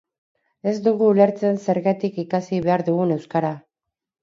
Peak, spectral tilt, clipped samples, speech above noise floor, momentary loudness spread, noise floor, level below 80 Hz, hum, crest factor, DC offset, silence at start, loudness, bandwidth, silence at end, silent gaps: -2 dBFS; -8 dB/octave; under 0.1%; 64 dB; 9 LU; -84 dBFS; -62 dBFS; none; 18 dB; under 0.1%; 0.65 s; -21 LUFS; 7.6 kHz; 0.65 s; none